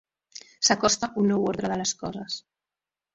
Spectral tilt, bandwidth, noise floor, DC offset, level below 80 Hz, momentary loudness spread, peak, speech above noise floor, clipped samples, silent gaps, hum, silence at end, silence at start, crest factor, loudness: -3 dB/octave; 7.8 kHz; under -90 dBFS; under 0.1%; -60 dBFS; 20 LU; -6 dBFS; over 65 dB; under 0.1%; none; none; 0.75 s; 0.35 s; 22 dB; -25 LUFS